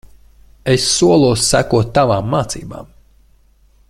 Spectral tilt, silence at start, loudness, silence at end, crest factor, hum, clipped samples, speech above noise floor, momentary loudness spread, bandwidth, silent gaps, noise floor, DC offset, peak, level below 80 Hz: -4.5 dB/octave; 0.65 s; -14 LUFS; 1.05 s; 14 dB; none; under 0.1%; 37 dB; 15 LU; 14.5 kHz; none; -51 dBFS; under 0.1%; -2 dBFS; -38 dBFS